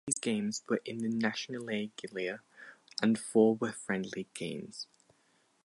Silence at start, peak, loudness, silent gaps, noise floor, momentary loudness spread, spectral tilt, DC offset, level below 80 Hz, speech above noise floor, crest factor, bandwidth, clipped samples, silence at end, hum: 0.05 s; -12 dBFS; -33 LUFS; none; -71 dBFS; 17 LU; -4.5 dB/octave; under 0.1%; -78 dBFS; 38 dB; 22 dB; 11.5 kHz; under 0.1%; 0.8 s; none